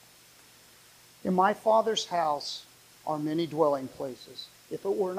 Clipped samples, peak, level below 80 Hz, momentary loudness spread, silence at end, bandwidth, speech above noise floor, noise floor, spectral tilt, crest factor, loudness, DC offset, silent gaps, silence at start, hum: under 0.1%; -12 dBFS; -72 dBFS; 16 LU; 0 s; 15.5 kHz; 28 dB; -56 dBFS; -5 dB/octave; 18 dB; -29 LUFS; under 0.1%; none; 1.25 s; none